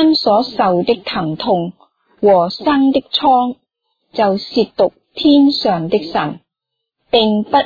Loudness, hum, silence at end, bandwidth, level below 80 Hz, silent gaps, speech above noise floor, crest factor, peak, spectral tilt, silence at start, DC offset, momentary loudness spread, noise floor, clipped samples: -15 LUFS; none; 0 s; 5 kHz; -52 dBFS; none; 64 dB; 14 dB; -2 dBFS; -7 dB/octave; 0 s; under 0.1%; 9 LU; -78 dBFS; under 0.1%